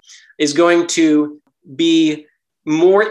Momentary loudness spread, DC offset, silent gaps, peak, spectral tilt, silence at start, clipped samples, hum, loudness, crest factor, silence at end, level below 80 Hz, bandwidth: 14 LU; under 0.1%; none; 0 dBFS; -4 dB/octave; 0.4 s; under 0.1%; none; -15 LUFS; 14 dB; 0 s; -68 dBFS; 11.5 kHz